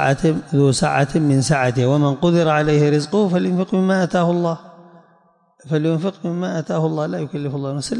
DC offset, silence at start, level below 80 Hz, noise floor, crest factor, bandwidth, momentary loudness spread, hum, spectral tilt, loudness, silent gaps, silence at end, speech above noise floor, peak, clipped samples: under 0.1%; 0 s; -50 dBFS; -57 dBFS; 14 dB; 11.5 kHz; 8 LU; none; -6.5 dB/octave; -18 LUFS; none; 0 s; 39 dB; -4 dBFS; under 0.1%